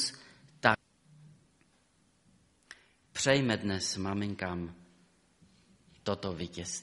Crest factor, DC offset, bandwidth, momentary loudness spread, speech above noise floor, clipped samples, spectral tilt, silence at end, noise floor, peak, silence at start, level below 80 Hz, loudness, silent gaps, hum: 30 dB; under 0.1%; 11.5 kHz; 25 LU; 37 dB; under 0.1%; -4 dB/octave; 0 s; -69 dBFS; -6 dBFS; 0 s; -64 dBFS; -33 LUFS; none; none